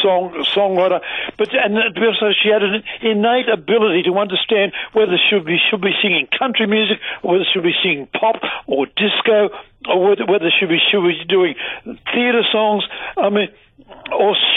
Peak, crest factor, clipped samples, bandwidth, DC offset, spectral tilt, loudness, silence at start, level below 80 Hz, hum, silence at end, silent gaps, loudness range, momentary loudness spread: -4 dBFS; 12 dB; under 0.1%; 4.1 kHz; under 0.1%; -7 dB/octave; -16 LUFS; 0 s; -58 dBFS; none; 0 s; none; 2 LU; 7 LU